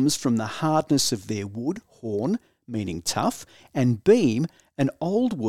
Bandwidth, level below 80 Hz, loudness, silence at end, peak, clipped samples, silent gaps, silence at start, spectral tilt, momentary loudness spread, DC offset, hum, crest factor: 16 kHz; -60 dBFS; -25 LUFS; 0 s; -6 dBFS; under 0.1%; none; 0 s; -5 dB/octave; 12 LU; 0.2%; none; 18 dB